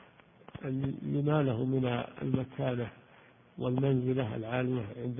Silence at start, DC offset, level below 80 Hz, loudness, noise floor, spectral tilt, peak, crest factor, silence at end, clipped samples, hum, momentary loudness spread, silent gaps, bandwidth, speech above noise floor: 0.55 s; under 0.1%; -62 dBFS; -33 LUFS; -59 dBFS; -11.5 dB/octave; -14 dBFS; 18 dB; 0 s; under 0.1%; none; 9 LU; none; 3.7 kHz; 28 dB